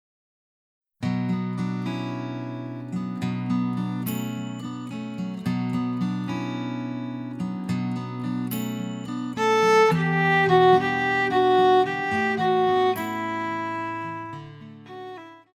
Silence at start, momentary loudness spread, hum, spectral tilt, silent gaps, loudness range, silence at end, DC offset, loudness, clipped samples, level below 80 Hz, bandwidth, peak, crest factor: 1 s; 15 LU; none; -6 dB/octave; none; 10 LU; 0.15 s; under 0.1%; -24 LUFS; under 0.1%; -62 dBFS; over 20 kHz; -6 dBFS; 18 dB